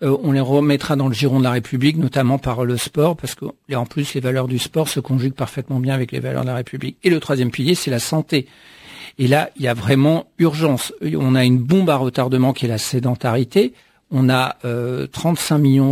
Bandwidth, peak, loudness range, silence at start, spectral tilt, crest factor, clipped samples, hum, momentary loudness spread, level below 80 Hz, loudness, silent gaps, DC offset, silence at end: 16 kHz; 0 dBFS; 4 LU; 0 s; -6 dB/octave; 18 dB; under 0.1%; none; 8 LU; -50 dBFS; -18 LUFS; none; under 0.1%; 0 s